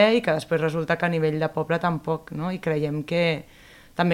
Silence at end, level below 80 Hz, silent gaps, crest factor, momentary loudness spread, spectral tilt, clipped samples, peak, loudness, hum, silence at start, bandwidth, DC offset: 0 s; -58 dBFS; none; 18 dB; 6 LU; -6.5 dB/octave; under 0.1%; -6 dBFS; -25 LUFS; none; 0 s; 15.5 kHz; under 0.1%